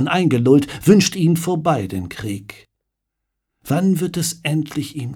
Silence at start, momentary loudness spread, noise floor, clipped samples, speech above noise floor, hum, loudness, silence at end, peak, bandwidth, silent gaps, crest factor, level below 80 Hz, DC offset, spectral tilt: 0 s; 13 LU; -78 dBFS; under 0.1%; 60 dB; none; -18 LUFS; 0 s; -2 dBFS; 18 kHz; none; 18 dB; -52 dBFS; under 0.1%; -5.5 dB/octave